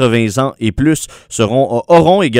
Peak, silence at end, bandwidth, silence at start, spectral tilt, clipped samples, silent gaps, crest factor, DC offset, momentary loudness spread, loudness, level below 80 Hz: 0 dBFS; 0 s; 16 kHz; 0 s; -5.5 dB/octave; 0.3%; none; 12 dB; under 0.1%; 8 LU; -13 LUFS; -36 dBFS